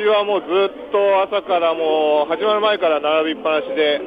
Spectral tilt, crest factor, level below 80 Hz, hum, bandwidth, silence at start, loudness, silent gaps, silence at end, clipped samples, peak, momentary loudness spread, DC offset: -6 dB/octave; 12 dB; -62 dBFS; none; 5 kHz; 0 s; -18 LUFS; none; 0 s; under 0.1%; -4 dBFS; 3 LU; under 0.1%